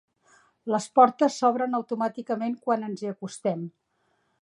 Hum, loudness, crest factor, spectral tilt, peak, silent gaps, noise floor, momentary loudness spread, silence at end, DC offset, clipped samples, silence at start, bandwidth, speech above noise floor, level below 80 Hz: none; -26 LUFS; 22 dB; -5.5 dB/octave; -4 dBFS; none; -71 dBFS; 14 LU; 0.7 s; under 0.1%; under 0.1%; 0.65 s; 11 kHz; 46 dB; -80 dBFS